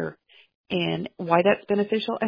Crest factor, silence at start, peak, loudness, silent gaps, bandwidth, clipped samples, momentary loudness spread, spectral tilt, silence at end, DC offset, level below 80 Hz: 20 dB; 0 s; -4 dBFS; -24 LUFS; 0.55-0.64 s; 5.2 kHz; under 0.1%; 10 LU; -8.5 dB/octave; 0 s; under 0.1%; -64 dBFS